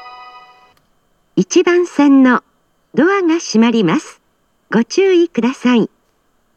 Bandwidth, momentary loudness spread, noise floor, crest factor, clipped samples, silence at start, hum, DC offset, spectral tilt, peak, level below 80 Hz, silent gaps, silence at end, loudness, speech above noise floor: 9.2 kHz; 9 LU; -61 dBFS; 14 dB; under 0.1%; 0 s; none; under 0.1%; -5 dB/octave; 0 dBFS; -68 dBFS; none; 0.7 s; -14 LUFS; 49 dB